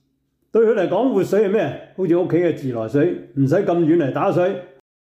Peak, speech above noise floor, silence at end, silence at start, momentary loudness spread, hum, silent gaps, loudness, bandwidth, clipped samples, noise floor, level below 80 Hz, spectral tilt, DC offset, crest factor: -8 dBFS; 50 dB; 0.45 s; 0.55 s; 6 LU; none; none; -19 LUFS; 13 kHz; under 0.1%; -68 dBFS; -66 dBFS; -8.5 dB/octave; under 0.1%; 12 dB